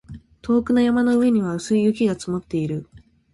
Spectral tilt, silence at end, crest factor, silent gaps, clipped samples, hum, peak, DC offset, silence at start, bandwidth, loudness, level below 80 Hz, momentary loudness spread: -6.5 dB/octave; 0.35 s; 12 dB; none; under 0.1%; none; -8 dBFS; under 0.1%; 0.1 s; 11.5 kHz; -20 LUFS; -50 dBFS; 10 LU